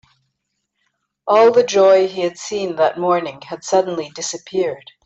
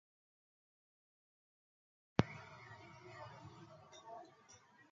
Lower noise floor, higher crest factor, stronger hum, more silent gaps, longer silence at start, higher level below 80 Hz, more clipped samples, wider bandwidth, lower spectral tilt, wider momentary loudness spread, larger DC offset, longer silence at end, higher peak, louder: first, -74 dBFS vs -65 dBFS; second, 14 dB vs 36 dB; neither; neither; second, 1.25 s vs 2.2 s; about the same, -64 dBFS vs -68 dBFS; neither; first, 8.2 kHz vs 7.4 kHz; second, -4 dB/octave vs -6 dB/octave; second, 13 LU vs 23 LU; neither; first, 0.25 s vs 0.05 s; first, -2 dBFS vs -12 dBFS; first, -17 LUFS vs -46 LUFS